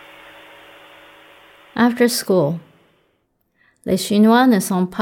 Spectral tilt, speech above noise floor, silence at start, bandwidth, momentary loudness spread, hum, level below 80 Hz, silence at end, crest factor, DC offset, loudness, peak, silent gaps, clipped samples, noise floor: -5 dB/octave; 51 dB; 1.75 s; 18 kHz; 16 LU; none; -60 dBFS; 0 s; 16 dB; under 0.1%; -16 LUFS; -2 dBFS; none; under 0.1%; -66 dBFS